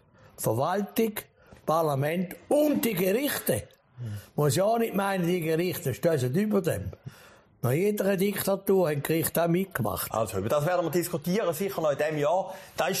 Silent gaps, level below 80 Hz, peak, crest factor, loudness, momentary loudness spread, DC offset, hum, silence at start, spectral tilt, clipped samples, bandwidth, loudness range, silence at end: none; -60 dBFS; -14 dBFS; 14 dB; -27 LUFS; 8 LU; under 0.1%; none; 0.4 s; -5.5 dB/octave; under 0.1%; 15.5 kHz; 1 LU; 0 s